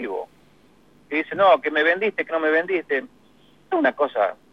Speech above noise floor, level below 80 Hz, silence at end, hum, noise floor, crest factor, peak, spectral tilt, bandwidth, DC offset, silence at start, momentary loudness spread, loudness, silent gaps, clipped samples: 35 dB; -70 dBFS; 0.2 s; 50 Hz at -65 dBFS; -56 dBFS; 18 dB; -6 dBFS; -6 dB/octave; 6.4 kHz; 0.1%; 0 s; 10 LU; -21 LUFS; none; under 0.1%